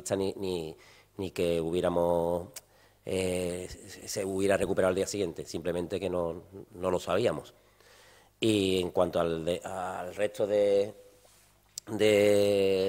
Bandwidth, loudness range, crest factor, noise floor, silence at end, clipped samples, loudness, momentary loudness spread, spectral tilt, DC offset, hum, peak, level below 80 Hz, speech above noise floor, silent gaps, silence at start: 16 kHz; 3 LU; 18 dB; -62 dBFS; 0 s; under 0.1%; -30 LUFS; 14 LU; -5 dB/octave; under 0.1%; 50 Hz at -65 dBFS; -12 dBFS; -60 dBFS; 33 dB; none; 0 s